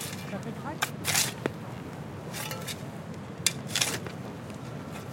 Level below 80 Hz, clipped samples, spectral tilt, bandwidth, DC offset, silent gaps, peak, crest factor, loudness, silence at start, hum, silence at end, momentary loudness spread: -64 dBFS; under 0.1%; -2.5 dB/octave; 17 kHz; under 0.1%; none; -6 dBFS; 28 dB; -32 LUFS; 0 s; none; 0 s; 14 LU